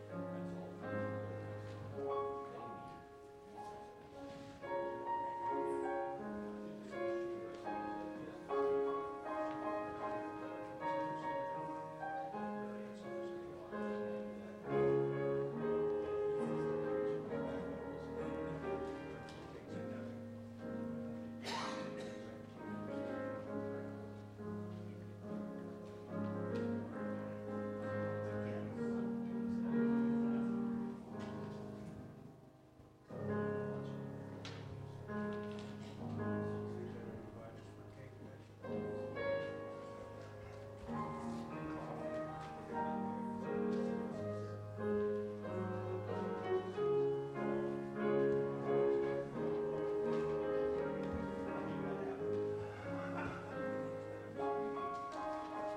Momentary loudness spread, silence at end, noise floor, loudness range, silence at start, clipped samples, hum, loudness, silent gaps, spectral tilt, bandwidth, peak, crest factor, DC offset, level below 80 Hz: 13 LU; 0 s; -62 dBFS; 8 LU; 0 s; under 0.1%; none; -42 LUFS; none; -7.5 dB/octave; 11 kHz; -24 dBFS; 18 dB; under 0.1%; -68 dBFS